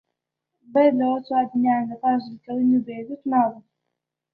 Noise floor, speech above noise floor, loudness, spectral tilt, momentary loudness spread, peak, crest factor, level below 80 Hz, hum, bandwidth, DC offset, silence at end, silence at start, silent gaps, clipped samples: -82 dBFS; 61 dB; -22 LUFS; -10 dB/octave; 8 LU; -6 dBFS; 16 dB; -68 dBFS; none; 4.7 kHz; under 0.1%; 0.75 s; 0.7 s; none; under 0.1%